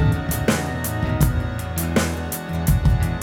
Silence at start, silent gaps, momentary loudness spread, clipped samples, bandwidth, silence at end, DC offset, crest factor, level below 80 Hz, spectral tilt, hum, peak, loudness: 0 s; none; 6 LU; under 0.1%; over 20 kHz; 0 s; under 0.1%; 16 dB; -28 dBFS; -5.5 dB/octave; none; -4 dBFS; -22 LUFS